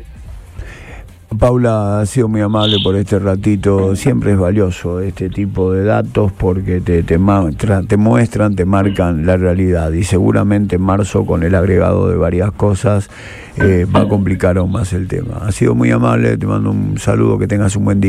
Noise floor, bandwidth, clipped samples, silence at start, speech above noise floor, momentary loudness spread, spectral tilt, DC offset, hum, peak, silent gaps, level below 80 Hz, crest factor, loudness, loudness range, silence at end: -33 dBFS; 13 kHz; under 0.1%; 0 s; 20 dB; 7 LU; -7 dB/octave; under 0.1%; none; 0 dBFS; none; -30 dBFS; 12 dB; -14 LUFS; 2 LU; 0 s